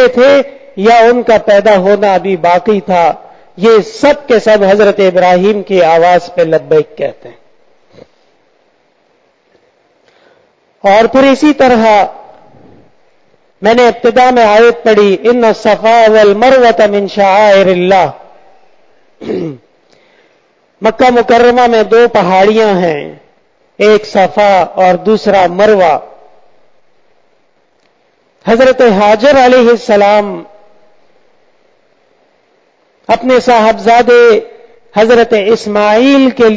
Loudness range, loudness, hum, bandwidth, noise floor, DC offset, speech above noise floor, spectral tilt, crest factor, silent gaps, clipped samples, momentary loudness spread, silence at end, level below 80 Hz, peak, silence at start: 8 LU; -7 LUFS; none; 8 kHz; -54 dBFS; under 0.1%; 47 dB; -5.5 dB/octave; 8 dB; none; under 0.1%; 9 LU; 0 s; -46 dBFS; 0 dBFS; 0 s